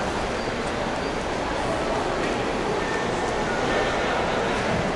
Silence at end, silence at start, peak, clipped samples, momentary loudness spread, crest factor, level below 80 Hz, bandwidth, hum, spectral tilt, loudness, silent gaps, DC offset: 0 s; 0 s; -12 dBFS; under 0.1%; 4 LU; 14 dB; -40 dBFS; 11.5 kHz; none; -4.5 dB/octave; -25 LUFS; none; under 0.1%